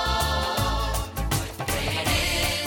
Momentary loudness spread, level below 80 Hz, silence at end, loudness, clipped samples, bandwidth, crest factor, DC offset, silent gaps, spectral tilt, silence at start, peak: 5 LU; -32 dBFS; 0 s; -25 LUFS; under 0.1%; 19 kHz; 14 dB; under 0.1%; none; -3.5 dB/octave; 0 s; -10 dBFS